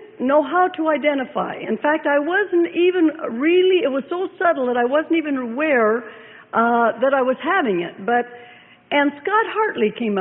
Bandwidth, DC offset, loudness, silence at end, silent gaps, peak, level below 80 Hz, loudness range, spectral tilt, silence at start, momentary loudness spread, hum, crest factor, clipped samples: 3.9 kHz; under 0.1%; -19 LUFS; 0 s; none; -4 dBFS; -68 dBFS; 2 LU; -10 dB/octave; 0 s; 7 LU; none; 16 dB; under 0.1%